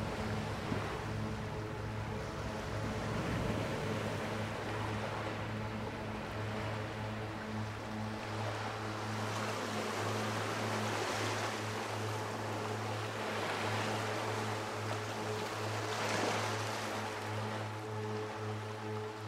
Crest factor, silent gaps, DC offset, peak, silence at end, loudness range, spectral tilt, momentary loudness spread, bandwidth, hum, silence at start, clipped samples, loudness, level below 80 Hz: 16 dB; none; under 0.1%; -22 dBFS; 0 s; 3 LU; -5 dB/octave; 5 LU; 16 kHz; none; 0 s; under 0.1%; -38 LUFS; -56 dBFS